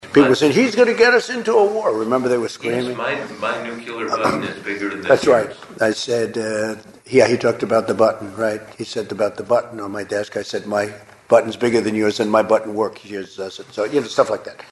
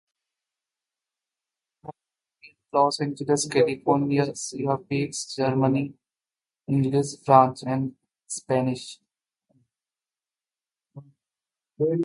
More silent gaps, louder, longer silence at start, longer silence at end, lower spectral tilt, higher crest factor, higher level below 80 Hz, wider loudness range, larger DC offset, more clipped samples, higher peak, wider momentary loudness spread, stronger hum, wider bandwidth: neither; first, -19 LUFS vs -24 LUFS; second, 0.05 s vs 1.85 s; about the same, 0.1 s vs 0 s; about the same, -5 dB/octave vs -5.5 dB/octave; second, 18 dB vs 24 dB; first, -60 dBFS vs -68 dBFS; second, 4 LU vs 9 LU; neither; neither; about the same, 0 dBFS vs -2 dBFS; second, 13 LU vs 16 LU; neither; about the same, 12 kHz vs 11.5 kHz